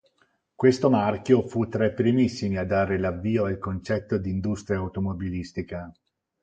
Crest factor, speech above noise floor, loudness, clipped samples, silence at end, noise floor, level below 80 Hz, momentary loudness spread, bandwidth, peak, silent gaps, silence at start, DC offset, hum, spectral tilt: 20 dB; 44 dB; -25 LUFS; under 0.1%; 0.5 s; -68 dBFS; -46 dBFS; 10 LU; 8.8 kHz; -6 dBFS; none; 0.6 s; under 0.1%; none; -7.5 dB/octave